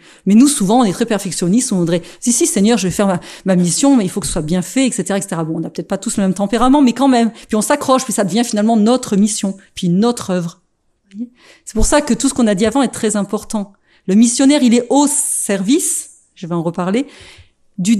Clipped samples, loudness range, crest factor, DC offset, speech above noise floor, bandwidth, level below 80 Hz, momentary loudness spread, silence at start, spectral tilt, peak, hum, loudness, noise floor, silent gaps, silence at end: under 0.1%; 3 LU; 14 dB; under 0.1%; 47 dB; 14 kHz; -34 dBFS; 12 LU; 0.25 s; -4.5 dB/octave; 0 dBFS; none; -15 LUFS; -61 dBFS; none; 0 s